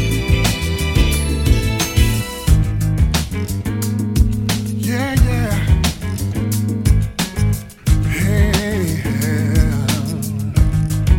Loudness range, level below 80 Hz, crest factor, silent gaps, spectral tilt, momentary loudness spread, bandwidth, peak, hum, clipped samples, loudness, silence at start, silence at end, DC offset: 1 LU; -20 dBFS; 16 dB; none; -5.5 dB/octave; 5 LU; 17 kHz; 0 dBFS; none; under 0.1%; -18 LUFS; 0 s; 0 s; under 0.1%